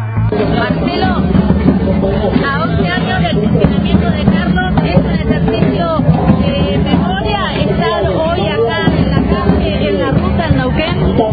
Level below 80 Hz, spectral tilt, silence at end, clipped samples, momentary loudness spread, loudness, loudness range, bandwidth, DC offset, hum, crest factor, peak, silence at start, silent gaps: -24 dBFS; -11 dB/octave; 0 s; under 0.1%; 2 LU; -13 LUFS; 1 LU; 5 kHz; under 0.1%; none; 12 dB; 0 dBFS; 0 s; none